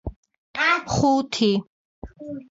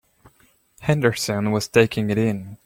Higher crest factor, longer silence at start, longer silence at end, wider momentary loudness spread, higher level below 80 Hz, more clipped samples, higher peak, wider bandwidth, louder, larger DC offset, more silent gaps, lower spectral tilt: second, 16 dB vs 22 dB; second, 0.05 s vs 0.8 s; about the same, 0.1 s vs 0.1 s; first, 17 LU vs 6 LU; first, -46 dBFS vs -54 dBFS; neither; second, -8 dBFS vs 0 dBFS; second, 7.8 kHz vs 16.5 kHz; about the same, -21 LUFS vs -21 LUFS; neither; first, 0.16-0.23 s, 0.38-0.54 s, 1.69-2.02 s vs none; about the same, -4.5 dB/octave vs -5.5 dB/octave